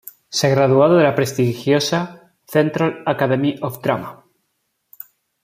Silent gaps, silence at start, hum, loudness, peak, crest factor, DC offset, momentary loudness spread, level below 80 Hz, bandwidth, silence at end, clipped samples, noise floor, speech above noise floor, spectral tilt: none; 0.3 s; none; -18 LUFS; -2 dBFS; 16 dB; under 0.1%; 21 LU; -60 dBFS; 16 kHz; 1.3 s; under 0.1%; -71 dBFS; 54 dB; -5.5 dB/octave